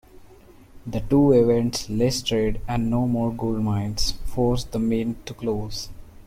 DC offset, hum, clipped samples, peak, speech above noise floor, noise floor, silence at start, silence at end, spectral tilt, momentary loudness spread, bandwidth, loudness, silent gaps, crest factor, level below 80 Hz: under 0.1%; none; under 0.1%; -6 dBFS; 26 dB; -48 dBFS; 0.15 s; 0.05 s; -6 dB/octave; 13 LU; 16 kHz; -23 LUFS; none; 16 dB; -36 dBFS